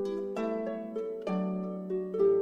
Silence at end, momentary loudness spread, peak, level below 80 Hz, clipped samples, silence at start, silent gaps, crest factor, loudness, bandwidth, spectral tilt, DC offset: 0 s; 8 LU; -16 dBFS; -72 dBFS; under 0.1%; 0 s; none; 16 dB; -33 LUFS; 7.8 kHz; -8.5 dB/octave; under 0.1%